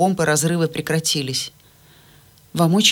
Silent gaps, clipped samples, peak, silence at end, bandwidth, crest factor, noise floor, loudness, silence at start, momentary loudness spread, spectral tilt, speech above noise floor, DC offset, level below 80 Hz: none; under 0.1%; -4 dBFS; 0 s; 18.5 kHz; 18 dB; -50 dBFS; -19 LUFS; 0 s; 9 LU; -4 dB/octave; 32 dB; under 0.1%; -56 dBFS